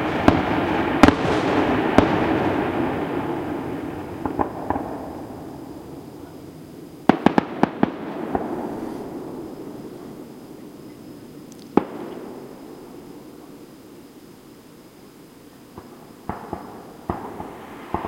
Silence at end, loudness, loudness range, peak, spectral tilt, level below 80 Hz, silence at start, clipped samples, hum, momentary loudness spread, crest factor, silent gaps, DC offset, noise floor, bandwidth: 0 s; -23 LUFS; 20 LU; 0 dBFS; -6.5 dB/octave; -46 dBFS; 0 s; under 0.1%; none; 24 LU; 24 dB; none; under 0.1%; -45 dBFS; 16.5 kHz